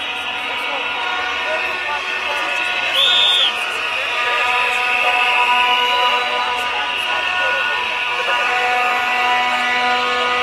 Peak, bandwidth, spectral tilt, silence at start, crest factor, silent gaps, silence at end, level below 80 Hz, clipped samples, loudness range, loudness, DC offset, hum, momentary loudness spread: -4 dBFS; 16 kHz; 0 dB/octave; 0 s; 14 dB; none; 0 s; -56 dBFS; under 0.1%; 3 LU; -16 LUFS; under 0.1%; none; 6 LU